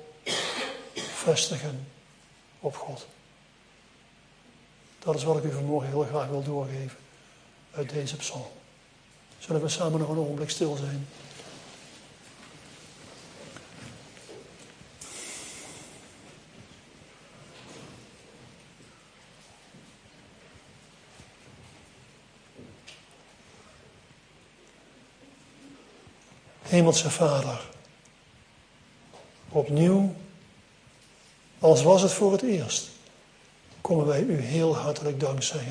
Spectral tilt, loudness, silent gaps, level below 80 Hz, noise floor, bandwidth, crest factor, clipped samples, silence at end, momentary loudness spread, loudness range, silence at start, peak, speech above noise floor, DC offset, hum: -5 dB/octave; -27 LUFS; none; -66 dBFS; -58 dBFS; 10.5 kHz; 26 dB; under 0.1%; 0 s; 27 LU; 23 LU; 0 s; -6 dBFS; 32 dB; under 0.1%; none